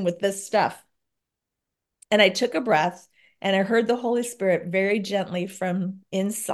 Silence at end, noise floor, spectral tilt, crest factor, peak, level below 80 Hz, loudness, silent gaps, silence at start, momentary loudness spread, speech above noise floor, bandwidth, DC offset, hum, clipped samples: 0 s; -85 dBFS; -4.5 dB/octave; 20 dB; -4 dBFS; -74 dBFS; -24 LUFS; none; 0 s; 9 LU; 61 dB; 12.5 kHz; under 0.1%; none; under 0.1%